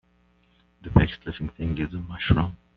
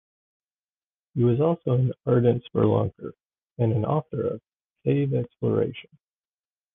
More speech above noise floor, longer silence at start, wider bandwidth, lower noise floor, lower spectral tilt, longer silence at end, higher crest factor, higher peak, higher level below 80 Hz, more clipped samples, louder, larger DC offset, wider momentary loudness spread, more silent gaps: second, 36 dB vs over 66 dB; second, 0.85 s vs 1.15 s; first, 5 kHz vs 3.7 kHz; second, -63 dBFS vs under -90 dBFS; second, -6 dB/octave vs -12 dB/octave; second, 0.2 s vs 0.9 s; first, 24 dB vs 18 dB; first, -2 dBFS vs -8 dBFS; first, -36 dBFS vs -54 dBFS; neither; about the same, -26 LUFS vs -25 LUFS; neither; about the same, 12 LU vs 11 LU; second, none vs 3.25-3.29 s, 4.55-4.60 s, 4.70-4.76 s